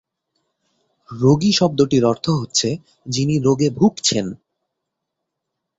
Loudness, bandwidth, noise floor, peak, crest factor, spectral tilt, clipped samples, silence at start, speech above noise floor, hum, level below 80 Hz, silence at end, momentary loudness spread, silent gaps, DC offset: -18 LUFS; 8.4 kHz; -79 dBFS; -2 dBFS; 18 dB; -5 dB/octave; under 0.1%; 1.1 s; 62 dB; none; -54 dBFS; 1.45 s; 10 LU; none; under 0.1%